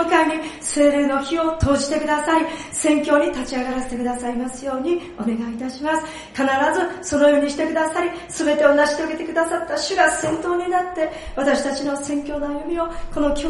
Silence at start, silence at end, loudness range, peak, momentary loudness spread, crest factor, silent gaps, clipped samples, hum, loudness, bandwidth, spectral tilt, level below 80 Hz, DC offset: 0 s; 0 s; 4 LU; -2 dBFS; 9 LU; 18 dB; none; under 0.1%; none; -20 LUFS; 11.5 kHz; -4 dB/octave; -42 dBFS; under 0.1%